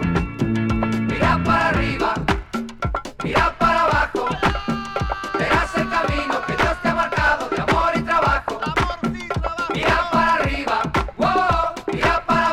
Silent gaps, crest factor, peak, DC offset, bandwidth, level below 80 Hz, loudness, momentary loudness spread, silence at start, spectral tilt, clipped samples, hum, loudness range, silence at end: none; 16 dB; -4 dBFS; under 0.1%; 16 kHz; -32 dBFS; -20 LUFS; 7 LU; 0 s; -5.5 dB/octave; under 0.1%; none; 1 LU; 0 s